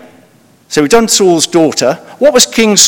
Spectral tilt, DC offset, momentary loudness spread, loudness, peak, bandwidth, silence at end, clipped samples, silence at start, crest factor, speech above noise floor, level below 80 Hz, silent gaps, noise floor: -2.5 dB/octave; under 0.1%; 7 LU; -9 LUFS; 0 dBFS; over 20 kHz; 0 s; 2%; 0.7 s; 10 dB; 37 dB; -44 dBFS; none; -45 dBFS